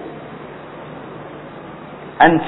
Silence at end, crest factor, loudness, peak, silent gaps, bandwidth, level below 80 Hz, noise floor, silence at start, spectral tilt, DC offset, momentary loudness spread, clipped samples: 0 s; 20 dB; -17 LUFS; 0 dBFS; none; 4.1 kHz; -50 dBFS; -34 dBFS; 0 s; -9.5 dB/octave; under 0.1%; 21 LU; under 0.1%